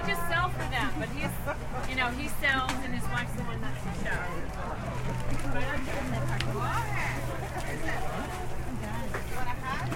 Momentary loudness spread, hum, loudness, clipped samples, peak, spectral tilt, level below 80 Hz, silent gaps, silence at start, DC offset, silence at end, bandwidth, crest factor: 7 LU; none; -32 LUFS; under 0.1%; -10 dBFS; -5 dB/octave; -38 dBFS; none; 0 s; under 0.1%; 0 s; 16.5 kHz; 18 dB